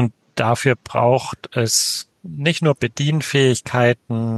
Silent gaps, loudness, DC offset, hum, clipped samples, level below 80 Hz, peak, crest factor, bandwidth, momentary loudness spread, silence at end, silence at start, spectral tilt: none; -19 LUFS; under 0.1%; none; under 0.1%; -56 dBFS; -2 dBFS; 18 dB; 12.5 kHz; 6 LU; 0 s; 0 s; -4.5 dB/octave